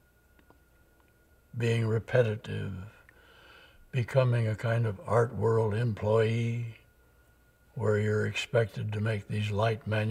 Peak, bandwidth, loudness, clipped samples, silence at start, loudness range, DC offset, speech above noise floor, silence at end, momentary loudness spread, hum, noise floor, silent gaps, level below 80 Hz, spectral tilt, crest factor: -10 dBFS; 10.5 kHz; -30 LUFS; under 0.1%; 1.55 s; 5 LU; under 0.1%; 35 dB; 0 s; 10 LU; none; -63 dBFS; none; -62 dBFS; -7 dB/octave; 20 dB